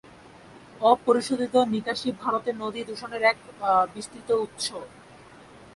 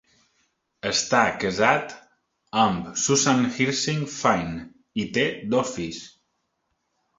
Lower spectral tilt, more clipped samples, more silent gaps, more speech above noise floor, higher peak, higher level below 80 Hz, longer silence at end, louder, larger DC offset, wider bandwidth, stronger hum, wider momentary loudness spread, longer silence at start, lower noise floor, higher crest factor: about the same, -4 dB/octave vs -3.5 dB/octave; neither; neither; second, 24 dB vs 52 dB; about the same, -4 dBFS vs -2 dBFS; second, -64 dBFS vs -56 dBFS; second, 0.1 s vs 1.1 s; about the same, -25 LUFS vs -23 LUFS; neither; first, 11.5 kHz vs 8 kHz; neither; about the same, 12 LU vs 13 LU; second, 0.05 s vs 0.85 s; second, -49 dBFS vs -75 dBFS; about the same, 22 dB vs 22 dB